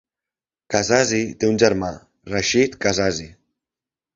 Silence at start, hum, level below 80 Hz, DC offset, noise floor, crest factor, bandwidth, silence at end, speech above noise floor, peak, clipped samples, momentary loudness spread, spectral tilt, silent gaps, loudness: 0.7 s; none; -48 dBFS; under 0.1%; -90 dBFS; 22 dB; 7.8 kHz; 0.85 s; 70 dB; 0 dBFS; under 0.1%; 11 LU; -3.5 dB/octave; none; -20 LUFS